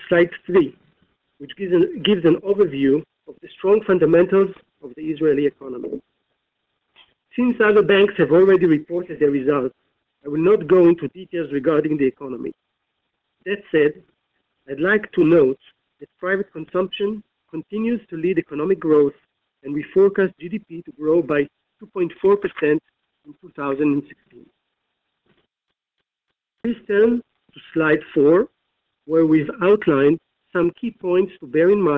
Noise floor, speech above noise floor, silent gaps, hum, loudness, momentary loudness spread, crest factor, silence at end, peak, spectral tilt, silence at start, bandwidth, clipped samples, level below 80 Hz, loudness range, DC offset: -80 dBFS; 62 dB; none; none; -19 LUFS; 15 LU; 16 dB; 0 s; -4 dBFS; -9 dB/octave; 0 s; 4 kHz; under 0.1%; -58 dBFS; 8 LU; under 0.1%